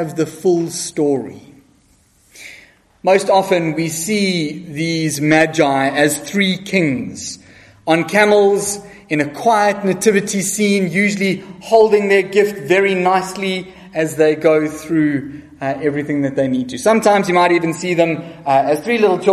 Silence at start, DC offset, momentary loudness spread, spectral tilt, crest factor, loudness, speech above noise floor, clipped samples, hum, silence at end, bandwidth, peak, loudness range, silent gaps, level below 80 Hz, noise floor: 0 s; under 0.1%; 11 LU; -4.5 dB/octave; 16 dB; -16 LUFS; 39 dB; under 0.1%; none; 0 s; 13.5 kHz; 0 dBFS; 4 LU; none; -56 dBFS; -54 dBFS